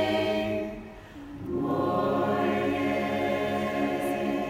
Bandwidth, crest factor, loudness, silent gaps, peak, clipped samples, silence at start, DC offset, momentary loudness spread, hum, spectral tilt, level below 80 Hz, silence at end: 16 kHz; 14 dB; -28 LUFS; none; -14 dBFS; under 0.1%; 0 s; under 0.1%; 14 LU; none; -6.5 dB/octave; -54 dBFS; 0 s